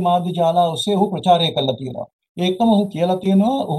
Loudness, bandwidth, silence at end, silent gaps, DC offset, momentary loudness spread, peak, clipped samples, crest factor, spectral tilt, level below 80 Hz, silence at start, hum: -18 LUFS; 12.5 kHz; 0 s; 2.13-2.19 s, 2.29-2.35 s; under 0.1%; 10 LU; -2 dBFS; under 0.1%; 16 dB; -6.5 dB/octave; -60 dBFS; 0 s; none